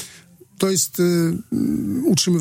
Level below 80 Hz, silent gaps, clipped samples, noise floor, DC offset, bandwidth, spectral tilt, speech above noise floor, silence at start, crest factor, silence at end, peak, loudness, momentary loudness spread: -54 dBFS; none; under 0.1%; -47 dBFS; under 0.1%; 16.5 kHz; -4.5 dB/octave; 28 dB; 0 s; 18 dB; 0 s; -2 dBFS; -20 LUFS; 5 LU